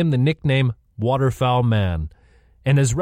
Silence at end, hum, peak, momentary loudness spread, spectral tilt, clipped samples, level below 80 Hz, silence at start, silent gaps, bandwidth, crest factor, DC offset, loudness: 0 s; none; -8 dBFS; 9 LU; -6.5 dB/octave; under 0.1%; -38 dBFS; 0 s; none; 10 kHz; 12 dB; under 0.1%; -20 LUFS